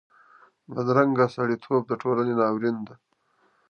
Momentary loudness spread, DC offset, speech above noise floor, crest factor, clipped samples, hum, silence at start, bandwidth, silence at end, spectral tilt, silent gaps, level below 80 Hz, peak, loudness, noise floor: 11 LU; under 0.1%; 43 dB; 20 dB; under 0.1%; none; 0.7 s; 6.8 kHz; 0.75 s; -8.5 dB/octave; none; -72 dBFS; -6 dBFS; -24 LUFS; -67 dBFS